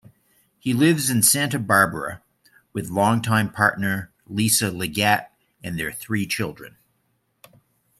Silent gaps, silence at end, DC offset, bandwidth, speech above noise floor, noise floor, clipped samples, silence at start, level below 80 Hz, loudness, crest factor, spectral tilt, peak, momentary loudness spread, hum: none; 1.3 s; under 0.1%; 16 kHz; 48 dB; -70 dBFS; under 0.1%; 0.65 s; -58 dBFS; -21 LUFS; 20 dB; -3.5 dB/octave; -2 dBFS; 15 LU; none